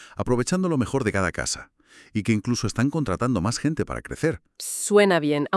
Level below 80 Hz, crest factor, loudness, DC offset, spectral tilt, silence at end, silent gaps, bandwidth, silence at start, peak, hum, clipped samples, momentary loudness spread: -48 dBFS; 18 dB; -24 LUFS; under 0.1%; -5 dB/octave; 0 s; none; 12 kHz; 0 s; -6 dBFS; none; under 0.1%; 10 LU